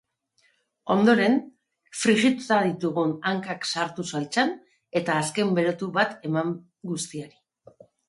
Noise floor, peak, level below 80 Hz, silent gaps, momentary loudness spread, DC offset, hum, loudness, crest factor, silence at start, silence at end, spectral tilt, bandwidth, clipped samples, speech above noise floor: -68 dBFS; -8 dBFS; -70 dBFS; none; 14 LU; under 0.1%; none; -25 LUFS; 18 dB; 0.85 s; 0.8 s; -4.5 dB/octave; 11.5 kHz; under 0.1%; 44 dB